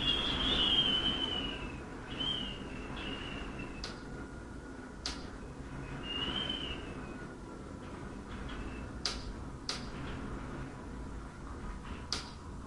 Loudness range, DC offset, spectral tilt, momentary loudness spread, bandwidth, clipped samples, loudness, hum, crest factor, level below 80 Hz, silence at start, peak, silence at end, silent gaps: 10 LU; under 0.1%; -3.5 dB/octave; 16 LU; 11.5 kHz; under 0.1%; -37 LUFS; none; 20 dB; -48 dBFS; 0 s; -18 dBFS; 0 s; none